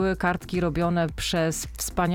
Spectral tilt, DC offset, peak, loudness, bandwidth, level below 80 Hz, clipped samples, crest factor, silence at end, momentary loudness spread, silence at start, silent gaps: -5 dB/octave; under 0.1%; -10 dBFS; -26 LUFS; 17 kHz; -40 dBFS; under 0.1%; 14 dB; 0 s; 4 LU; 0 s; none